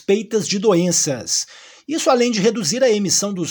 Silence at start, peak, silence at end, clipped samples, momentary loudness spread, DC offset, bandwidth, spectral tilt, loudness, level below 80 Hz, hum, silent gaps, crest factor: 0.1 s; -2 dBFS; 0 s; under 0.1%; 5 LU; under 0.1%; 19 kHz; -3.5 dB/octave; -17 LUFS; -68 dBFS; none; none; 16 dB